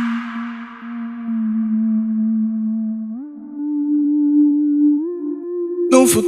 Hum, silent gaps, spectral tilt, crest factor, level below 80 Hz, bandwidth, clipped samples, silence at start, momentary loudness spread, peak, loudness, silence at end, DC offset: none; none; -5 dB/octave; 18 dB; -64 dBFS; 13.5 kHz; under 0.1%; 0 s; 14 LU; 0 dBFS; -19 LUFS; 0 s; under 0.1%